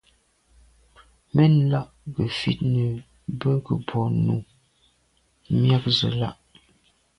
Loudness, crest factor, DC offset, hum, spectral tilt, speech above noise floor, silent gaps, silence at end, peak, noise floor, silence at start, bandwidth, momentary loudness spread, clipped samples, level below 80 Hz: -23 LUFS; 18 dB; under 0.1%; none; -7.5 dB/octave; 44 dB; none; 0.85 s; -6 dBFS; -65 dBFS; 1.35 s; 10.5 kHz; 11 LU; under 0.1%; -52 dBFS